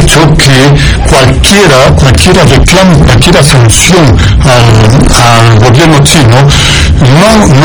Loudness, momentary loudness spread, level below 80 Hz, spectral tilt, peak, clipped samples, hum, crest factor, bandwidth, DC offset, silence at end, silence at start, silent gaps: -3 LUFS; 2 LU; -12 dBFS; -4.5 dB/octave; 0 dBFS; 20%; none; 2 dB; over 20 kHz; 3%; 0 s; 0 s; none